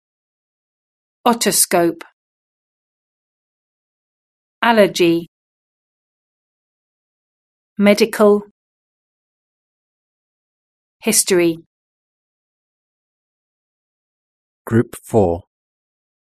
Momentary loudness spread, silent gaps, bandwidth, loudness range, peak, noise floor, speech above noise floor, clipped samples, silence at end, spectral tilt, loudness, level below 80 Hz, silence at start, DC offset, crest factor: 10 LU; 2.13-4.62 s, 5.28-7.76 s, 8.51-11.00 s, 11.66-14.65 s; 13.5 kHz; 4 LU; 0 dBFS; under -90 dBFS; over 75 dB; under 0.1%; 0.8 s; -4 dB/octave; -16 LUFS; -54 dBFS; 1.25 s; under 0.1%; 22 dB